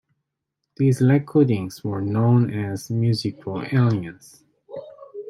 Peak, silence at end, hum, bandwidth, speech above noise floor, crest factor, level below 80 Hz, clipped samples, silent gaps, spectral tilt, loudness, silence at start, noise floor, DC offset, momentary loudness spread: -6 dBFS; 0 s; none; 13 kHz; 60 dB; 16 dB; -62 dBFS; under 0.1%; none; -8 dB/octave; -21 LUFS; 0.8 s; -80 dBFS; under 0.1%; 20 LU